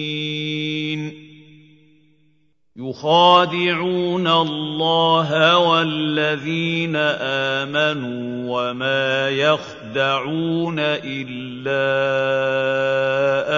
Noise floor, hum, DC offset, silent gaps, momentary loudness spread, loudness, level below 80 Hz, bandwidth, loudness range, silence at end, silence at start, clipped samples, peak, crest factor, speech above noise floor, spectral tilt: -64 dBFS; none; under 0.1%; none; 11 LU; -19 LUFS; -66 dBFS; 7.4 kHz; 4 LU; 0 s; 0 s; under 0.1%; 0 dBFS; 18 dB; 45 dB; -5.5 dB/octave